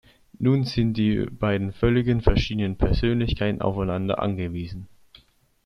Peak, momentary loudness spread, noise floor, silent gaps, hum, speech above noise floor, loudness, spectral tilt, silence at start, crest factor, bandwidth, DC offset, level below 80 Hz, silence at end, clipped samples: -4 dBFS; 6 LU; -57 dBFS; none; none; 35 dB; -24 LUFS; -8 dB/octave; 0.4 s; 20 dB; 6.8 kHz; under 0.1%; -34 dBFS; 0.8 s; under 0.1%